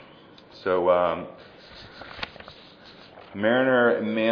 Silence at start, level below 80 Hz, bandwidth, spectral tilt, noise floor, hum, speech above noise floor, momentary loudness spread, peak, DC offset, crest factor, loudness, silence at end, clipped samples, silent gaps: 0.55 s; -62 dBFS; 5.4 kHz; -7.5 dB/octave; -50 dBFS; none; 27 dB; 24 LU; -8 dBFS; under 0.1%; 18 dB; -23 LUFS; 0 s; under 0.1%; none